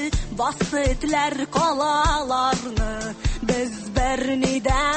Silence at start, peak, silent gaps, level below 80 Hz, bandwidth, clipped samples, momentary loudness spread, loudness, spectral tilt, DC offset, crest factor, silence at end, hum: 0 s; -8 dBFS; none; -30 dBFS; 8.8 kHz; under 0.1%; 6 LU; -23 LUFS; -4.5 dB/octave; under 0.1%; 14 dB; 0 s; none